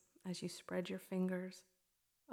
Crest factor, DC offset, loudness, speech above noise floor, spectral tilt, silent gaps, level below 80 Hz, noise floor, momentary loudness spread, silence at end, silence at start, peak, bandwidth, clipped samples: 16 dB; under 0.1%; -44 LUFS; 39 dB; -6 dB/octave; none; -88 dBFS; -82 dBFS; 10 LU; 0 s; 0.25 s; -28 dBFS; 16 kHz; under 0.1%